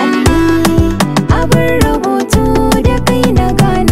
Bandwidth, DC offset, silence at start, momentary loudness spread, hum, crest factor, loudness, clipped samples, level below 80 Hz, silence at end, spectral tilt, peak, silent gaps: 16.5 kHz; 6%; 0 s; 2 LU; none; 10 dB; -11 LUFS; under 0.1%; -20 dBFS; 0 s; -6 dB/octave; 0 dBFS; none